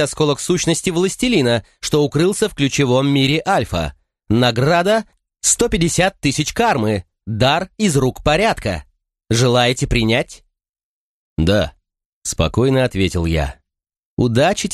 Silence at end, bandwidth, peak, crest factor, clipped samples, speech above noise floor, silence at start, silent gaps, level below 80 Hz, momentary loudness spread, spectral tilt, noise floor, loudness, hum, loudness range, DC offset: 0 s; 13 kHz; -2 dBFS; 16 dB; under 0.1%; 57 dB; 0 s; 10.69-10.73 s, 10.83-11.36 s, 12.05-12.22 s, 13.99-14.17 s; -34 dBFS; 8 LU; -4.5 dB/octave; -73 dBFS; -17 LUFS; none; 3 LU; under 0.1%